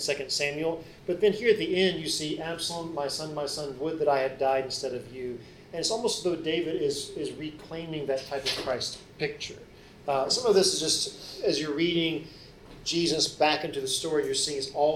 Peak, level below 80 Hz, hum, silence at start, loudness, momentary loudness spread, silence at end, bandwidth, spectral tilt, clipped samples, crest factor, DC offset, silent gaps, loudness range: -10 dBFS; -58 dBFS; none; 0 s; -28 LUFS; 13 LU; 0 s; 16 kHz; -3 dB/octave; under 0.1%; 20 dB; under 0.1%; none; 4 LU